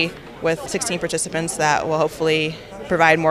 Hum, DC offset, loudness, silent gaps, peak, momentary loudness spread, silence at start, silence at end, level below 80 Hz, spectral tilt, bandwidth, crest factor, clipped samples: none; under 0.1%; -20 LUFS; none; -2 dBFS; 8 LU; 0 s; 0 s; -50 dBFS; -3.5 dB/octave; 15 kHz; 18 dB; under 0.1%